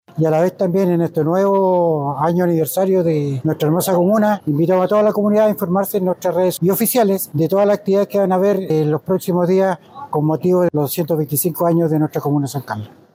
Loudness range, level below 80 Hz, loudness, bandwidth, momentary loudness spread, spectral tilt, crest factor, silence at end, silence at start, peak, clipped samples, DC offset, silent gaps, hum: 2 LU; -66 dBFS; -17 LUFS; 16.5 kHz; 5 LU; -7 dB/octave; 12 dB; 0.3 s; 0.15 s; -6 dBFS; under 0.1%; under 0.1%; none; none